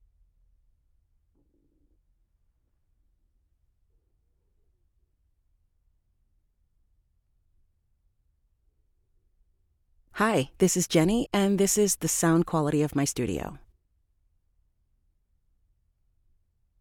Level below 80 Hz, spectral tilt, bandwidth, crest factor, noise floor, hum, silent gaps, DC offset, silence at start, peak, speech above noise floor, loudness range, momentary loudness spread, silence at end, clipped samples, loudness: -56 dBFS; -4.5 dB/octave; 18 kHz; 24 dB; -71 dBFS; none; none; under 0.1%; 10.15 s; -8 dBFS; 46 dB; 10 LU; 8 LU; 3.25 s; under 0.1%; -25 LUFS